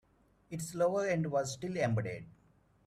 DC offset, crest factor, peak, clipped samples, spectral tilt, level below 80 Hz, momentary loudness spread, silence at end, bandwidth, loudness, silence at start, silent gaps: under 0.1%; 18 dB; -18 dBFS; under 0.1%; -6 dB/octave; -68 dBFS; 11 LU; 0.55 s; 14.5 kHz; -34 LUFS; 0.5 s; none